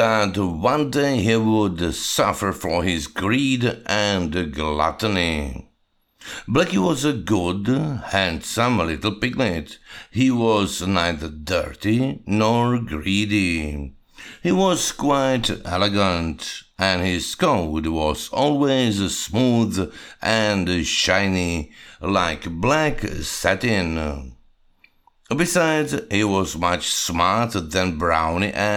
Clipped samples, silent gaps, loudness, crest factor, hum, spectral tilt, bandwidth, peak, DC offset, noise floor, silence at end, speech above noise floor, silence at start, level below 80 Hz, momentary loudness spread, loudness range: under 0.1%; none; -21 LUFS; 20 dB; none; -4.5 dB/octave; 18.5 kHz; -2 dBFS; under 0.1%; -65 dBFS; 0 s; 45 dB; 0 s; -40 dBFS; 9 LU; 2 LU